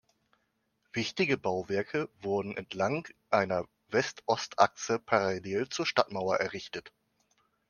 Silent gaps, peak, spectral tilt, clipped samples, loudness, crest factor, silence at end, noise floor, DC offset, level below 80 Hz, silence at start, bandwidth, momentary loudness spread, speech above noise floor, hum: none; -6 dBFS; -4.5 dB/octave; under 0.1%; -31 LUFS; 26 dB; 0.8 s; -77 dBFS; under 0.1%; -72 dBFS; 0.95 s; 10 kHz; 8 LU; 46 dB; none